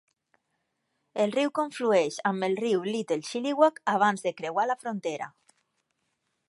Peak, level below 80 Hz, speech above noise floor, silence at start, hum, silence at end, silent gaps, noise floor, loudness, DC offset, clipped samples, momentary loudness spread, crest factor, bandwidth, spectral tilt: -8 dBFS; -82 dBFS; 52 dB; 1.15 s; none; 1.2 s; none; -78 dBFS; -27 LUFS; under 0.1%; under 0.1%; 9 LU; 22 dB; 11.5 kHz; -4.5 dB/octave